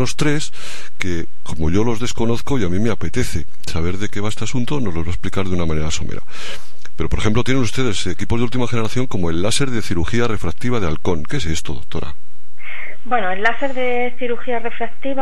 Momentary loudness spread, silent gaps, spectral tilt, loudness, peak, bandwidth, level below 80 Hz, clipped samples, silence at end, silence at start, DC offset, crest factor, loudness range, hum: 11 LU; none; -5 dB/octave; -22 LUFS; 0 dBFS; 14 kHz; -34 dBFS; under 0.1%; 0 s; 0 s; 30%; 18 dB; 3 LU; none